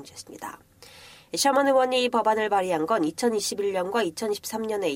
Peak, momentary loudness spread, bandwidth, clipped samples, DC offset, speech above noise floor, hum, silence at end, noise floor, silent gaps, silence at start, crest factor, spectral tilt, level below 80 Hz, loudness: -10 dBFS; 17 LU; 16 kHz; under 0.1%; under 0.1%; 24 dB; none; 0 s; -49 dBFS; none; 0 s; 16 dB; -3 dB/octave; -66 dBFS; -24 LUFS